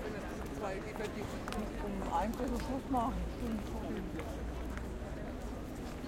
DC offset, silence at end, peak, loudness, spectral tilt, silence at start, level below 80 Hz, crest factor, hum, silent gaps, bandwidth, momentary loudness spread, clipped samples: under 0.1%; 0 s; -22 dBFS; -40 LUFS; -6 dB/octave; 0 s; -46 dBFS; 16 dB; none; none; 16.5 kHz; 8 LU; under 0.1%